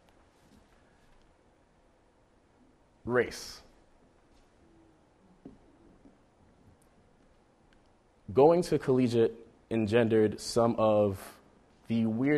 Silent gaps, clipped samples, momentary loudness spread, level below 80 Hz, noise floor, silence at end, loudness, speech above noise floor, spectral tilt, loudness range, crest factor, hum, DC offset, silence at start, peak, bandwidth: none; under 0.1%; 20 LU; -62 dBFS; -65 dBFS; 0 s; -28 LUFS; 39 dB; -6.5 dB/octave; 12 LU; 22 dB; none; under 0.1%; 3.05 s; -10 dBFS; 14 kHz